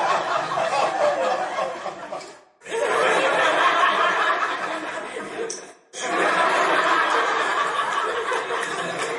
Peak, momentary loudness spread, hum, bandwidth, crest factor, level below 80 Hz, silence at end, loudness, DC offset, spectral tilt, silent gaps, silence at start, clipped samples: -6 dBFS; 13 LU; none; 11.5 kHz; 16 dB; -72 dBFS; 0 s; -22 LUFS; under 0.1%; -2 dB/octave; none; 0 s; under 0.1%